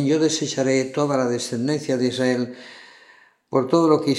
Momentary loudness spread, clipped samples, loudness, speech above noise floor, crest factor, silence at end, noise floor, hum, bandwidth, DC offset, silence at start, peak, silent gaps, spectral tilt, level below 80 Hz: 8 LU; under 0.1%; -21 LUFS; 32 dB; 16 dB; 0 s; -53 dBFS; none; 12.5 kHz; under 0.1%; 0 s; -4 dBFS; none; -5 dB/octave; -72 dBFS